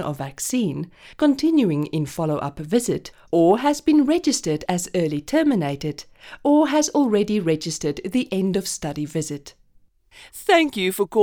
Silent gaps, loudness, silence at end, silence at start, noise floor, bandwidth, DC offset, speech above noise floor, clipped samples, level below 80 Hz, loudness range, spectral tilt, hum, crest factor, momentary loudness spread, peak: none; -21 LUFS; 0 s; 0 s; -57 dBFS; 19 kHz; under 0.1%; 36 dB; under 0.1%; -52 dBFS; 4 LU; -5 dB/octave; none; 16 dB; 11 LU; -4 dBFS